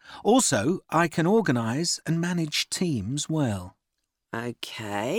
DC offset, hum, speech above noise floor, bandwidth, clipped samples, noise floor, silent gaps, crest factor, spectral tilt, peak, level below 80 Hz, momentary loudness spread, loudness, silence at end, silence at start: under 0.1%; none; 56 dB; 18 kHz; under 0.1%; -81 dBFS; none; 18 dB; -4.5 dB/octave; -8 dBFS; -64 dBFS; 13 LU; -25 LUFS; 0 s; 0.05 s